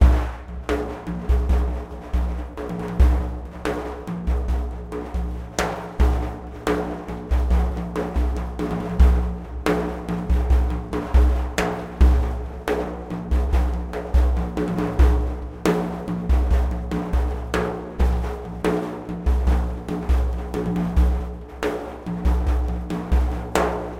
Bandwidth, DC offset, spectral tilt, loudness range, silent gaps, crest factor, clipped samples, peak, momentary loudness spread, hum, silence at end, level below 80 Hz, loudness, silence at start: 10 kHz; under 0.1%; -7 dB/octave; 3 LU; none; 20 dB; under 0.1%; 0 dBFS; 10 LU; none; 0 s; -22 dBFS; -24 LUFS; 0 s